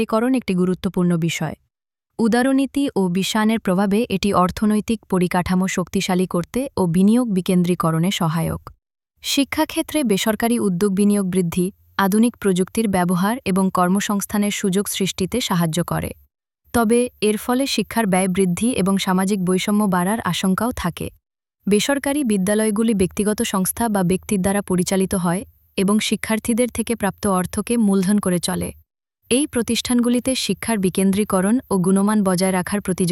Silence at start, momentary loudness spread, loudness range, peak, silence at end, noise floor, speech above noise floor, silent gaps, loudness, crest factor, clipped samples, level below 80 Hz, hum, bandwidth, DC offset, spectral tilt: 0 s; 5 LU; 2 LU; -4 dBFS; 0 s; -79 dBFS; 60 dB; none; -19 LUFS; 16 dB; under 0.1%; -46 dBFS; none; 16.5 kHz; under 0.1%; -5 dB/octave